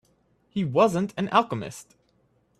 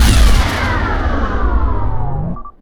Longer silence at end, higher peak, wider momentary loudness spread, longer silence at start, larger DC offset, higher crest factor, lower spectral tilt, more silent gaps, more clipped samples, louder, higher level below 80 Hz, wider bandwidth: first, 0.75 s vs 0.1 s; second, -4 dBFS vs 0 dBFS; first, 15 LU vs 9 LU; first, 0.55 s vs 0 s; neither; first, 22 dB vs 12 dB; about the same, -6 dB/octave vs -5 dB/octave; neither; neither; second, -25 LUFS vs -17 LUFS; second, -62 dBFS vs -14 dBFS; second, 13.5 kHz vs 18.5 kHz